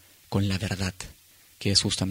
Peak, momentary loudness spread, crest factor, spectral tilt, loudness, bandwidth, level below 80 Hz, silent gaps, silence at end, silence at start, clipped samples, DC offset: -6 dBFS; 15 LU; 22 dB; -4 dB/octave; -26 LUFS; 16 kHz; -50 dBFS; none; 0 s; 0.3 s; under 0.1%; under 0.1%